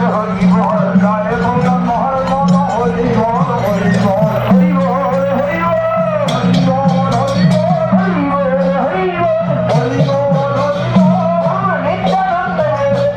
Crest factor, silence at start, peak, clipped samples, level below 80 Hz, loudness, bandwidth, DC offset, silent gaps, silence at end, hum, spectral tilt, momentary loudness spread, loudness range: 12 dB; 0 s; 0 dBFS; under 0.1%; -38 dBFS; -13 LUFS; 8.8 kHz; under 0.1%; none; 0 s; none; -8 dB/octave; 3 LU; 1 LU